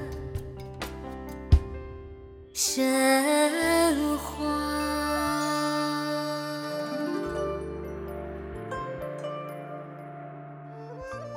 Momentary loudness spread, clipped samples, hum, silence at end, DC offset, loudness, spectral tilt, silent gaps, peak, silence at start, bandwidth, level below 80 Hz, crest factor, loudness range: 18 LU; under 0.1%; none; 0 s; under 0.1%; -28 LUFS; -4.5 dB/octave; none; -8 dBFS; 0 s; 17.5 kHz; -38 dBFS; 20 dB; 12 LU